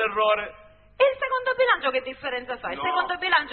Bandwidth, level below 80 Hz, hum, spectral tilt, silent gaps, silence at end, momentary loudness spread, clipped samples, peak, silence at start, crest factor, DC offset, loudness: 4.5 kHz; -58 dBFS; none; -7 dB/octave; none; 0 s; 9 LU; under 0.1%; -6 dBFS; 0 s; 18 dB; under 0.1%; -24 LUFS